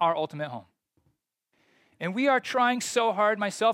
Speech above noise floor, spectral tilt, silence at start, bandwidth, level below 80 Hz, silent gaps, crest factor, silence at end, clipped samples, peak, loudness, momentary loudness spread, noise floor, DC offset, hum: 50 dB; -3.5 dB/octave; 0 s; 16 kHz; -80 dBFS; none; 16 dB; 0 s; under 0.1%; -10 dBFS; -26 LUFS; 12 LU; -75 dBFS; under 0.1%; none